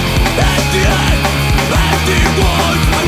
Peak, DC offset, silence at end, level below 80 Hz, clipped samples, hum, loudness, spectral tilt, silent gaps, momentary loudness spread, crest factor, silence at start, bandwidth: 0 dBFS; under 0.1%; 0 s; -18 dBFS; under 0.1%; none; -12 LUFS; -4.5 dB/octave; none; 1 LU; 12 dB; 0 s; 16 kHz